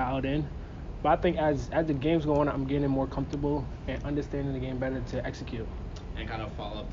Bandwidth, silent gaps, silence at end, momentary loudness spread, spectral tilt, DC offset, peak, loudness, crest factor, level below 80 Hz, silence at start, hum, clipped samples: 7.6 kHz; none; 0 s; 12 LU; -8 dB/octave; under 0.1%; -12 dBFS; -30 LUFS; 18 dB; -40 dBFS; 0 s; none; under 0.1%